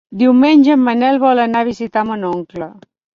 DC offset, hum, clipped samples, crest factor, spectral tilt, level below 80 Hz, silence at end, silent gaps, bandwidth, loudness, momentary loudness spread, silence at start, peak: under 0.1%; none; under 0.1%; 12 dB; -6.5 dB/octave; -56 dBFS; 0.45 s; none; 7 kHz; -13 LUFS; 16 LU; 0.1 s; -2 dBFS